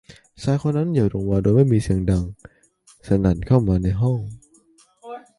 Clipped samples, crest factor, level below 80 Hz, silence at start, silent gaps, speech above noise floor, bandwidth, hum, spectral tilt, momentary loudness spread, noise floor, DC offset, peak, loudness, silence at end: under 0.1%; 18 dB; -36 dBFS; 0.1 s; none; 37 dB; 11.5 kHz; none; -9 dB/octave; 13 LU; -56 dBFS; under 0.1%; -4 dBFS; -20 LUFS; 0.2 s